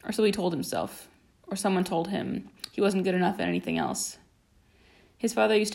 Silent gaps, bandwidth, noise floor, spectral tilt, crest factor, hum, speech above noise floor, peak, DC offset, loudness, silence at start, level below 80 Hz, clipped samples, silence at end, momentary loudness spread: none; 16 kHz; -63 dBFS; -5 dB/octave; 18 dB; none; 35 dB; -10 dBFS; under 0.1%; -28 LUFS; 0.05 s; -62 dBFS; under 0.1%; 0 s; 11 LU